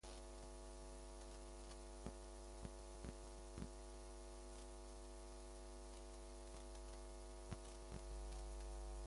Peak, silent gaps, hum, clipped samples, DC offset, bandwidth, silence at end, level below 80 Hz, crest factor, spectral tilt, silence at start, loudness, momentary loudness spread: -34 dBFS; none; none; under 0.1%; under 0.1%; 11.5 kHz; 0 s; -56 dBFS; 20 dB; -4.5 dB/octave; 0.05 s; -56 LUFS; 4 LU